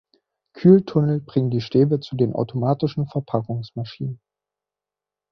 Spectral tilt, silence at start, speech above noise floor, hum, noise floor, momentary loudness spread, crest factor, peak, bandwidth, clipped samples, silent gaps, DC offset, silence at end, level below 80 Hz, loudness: -10 dB/octave; 0.55 s; 69 dB; 50 Hz at -45 dBFS; -89 dBFS; 15 LU; 20 dB; -2 dBFS; 6.2 kHz; under 0.1%; none; under 0.1%; 1.15 s; -58 dBFS; -21 LUFS